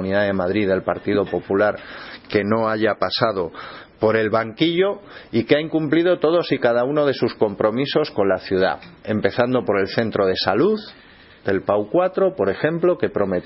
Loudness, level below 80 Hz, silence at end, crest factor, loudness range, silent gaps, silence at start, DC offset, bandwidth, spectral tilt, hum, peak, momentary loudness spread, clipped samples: -20 LUFS; -56 dBFS; 0 s; 20 dB; 2 LU; none; 0 s; under 0.1%; 5.8 kHz; -10 dB/octave; none; 0 dBFS; 7 LU; under 0.1%